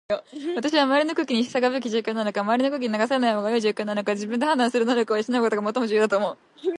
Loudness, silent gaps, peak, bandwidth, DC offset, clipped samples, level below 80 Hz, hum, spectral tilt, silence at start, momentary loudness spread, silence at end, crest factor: -23 LUFS; none; -4 dBFS; 11.5 kHz; under 0.1%; under 0.1%; -72 dBFS; none; -4.5 dB/octave; 0.1 s; 5 LU; 0.05 s; 18 dB